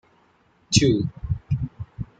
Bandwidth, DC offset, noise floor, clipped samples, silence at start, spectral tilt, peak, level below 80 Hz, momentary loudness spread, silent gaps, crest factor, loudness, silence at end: 9.4 kHz; under 0.1%; -61 dBFS; under 0.1%; 0.7 s; -5 dB/octave; -2 dBFS; -40 dBFS; 14 LU; none; 22 dB; -23 LUFS; 0.15 s